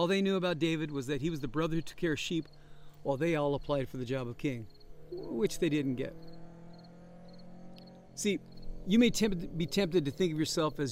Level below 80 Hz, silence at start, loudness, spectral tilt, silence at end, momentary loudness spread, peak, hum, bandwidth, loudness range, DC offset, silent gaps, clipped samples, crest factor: -52 dBFS; 0 s; -33 LUFS; -5.5 dB/octave; 0 s; 23 LU; -14 dBFS; none; 16 kHz; 6 LU; under 0.1%; none; under 0.1%; 18 dB